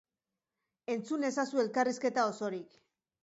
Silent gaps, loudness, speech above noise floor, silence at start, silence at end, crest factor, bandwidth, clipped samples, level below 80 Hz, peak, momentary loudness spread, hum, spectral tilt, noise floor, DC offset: none; -33 LUFS; over 57 dB; 0.9 s; 0.6 s; 16 dB; 8 kHz; under 0.1%; -86 dBFS; -18 dBFS; 8 LU; none; -4.5 dB/octave; under -90 dBFS; under 0.1%